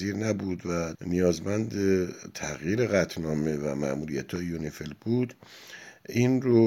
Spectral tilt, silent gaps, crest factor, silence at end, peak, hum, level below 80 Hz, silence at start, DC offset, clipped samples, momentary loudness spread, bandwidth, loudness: -6.5 dB/octave; none; 18 dB; 0 s; -10 dBFS; none; -54 dBFS; 0 s; under 0.1%; under 0.1%; 11 LU; 16.5 kHz; -29 LUFS